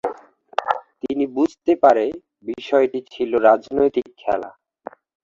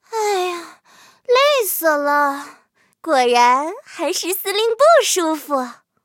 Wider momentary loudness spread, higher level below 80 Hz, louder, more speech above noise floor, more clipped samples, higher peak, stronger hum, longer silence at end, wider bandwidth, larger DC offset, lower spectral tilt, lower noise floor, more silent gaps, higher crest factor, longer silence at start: first, 20 LU vs 15 LU; first, -58 dBFS vs -80 dBFS; second, -20 LUFS vs -17 LUFS; second, 22 dB vs 33 dB; neither; about the same, -2 dBFS vs 0 dBFS; neither; first, 0.75 s vs 0.3 s; second, 7.6 kHz vs 17 kHz; neither; first, -6 dB/octave vs 0.5 dB/octave; second, -41 dBFS vs -50 dBFS; neither; about the same, 18 dB vs 18 dB; about the same, 0.05 s vs 0.1 s